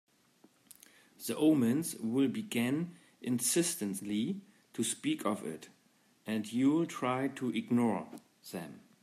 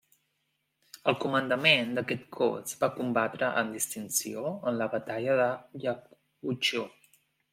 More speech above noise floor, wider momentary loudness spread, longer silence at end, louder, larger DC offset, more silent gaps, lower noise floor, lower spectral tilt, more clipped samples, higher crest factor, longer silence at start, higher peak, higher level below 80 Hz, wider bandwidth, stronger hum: second, 36 dB vs 49 dB; first, 15 LU vs 11 LU; second, 0.25 s vs 0.65 s; second, -33 LUFS vs -29 LUFS; neither; neither; second, -69 dBFS vs -78 dBFS; first, -4.5 dB/octave vs -3 dB/octave; neither; second, 16 dB vs 24 dB; first, 1.2 s vs 1.05 s; second, -18 dBFS vs -8 dBFS; second, -82 dBFS vs -76 dBFS; about the same, 15.5 kHz vs 16.5 kHz; neither